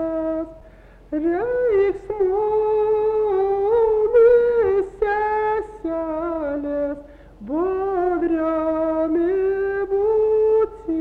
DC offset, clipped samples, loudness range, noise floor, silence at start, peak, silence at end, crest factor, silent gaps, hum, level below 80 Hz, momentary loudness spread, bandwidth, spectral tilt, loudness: under 0.1%; under 0.1%; 6 LU; -46 dBFS; 0 s; -8 dBFS; 0 s; 12 dB; none; none; -46 dBFS; 9 LU; 4.3 kHz; -8.5 dB/octave; -20 LUFS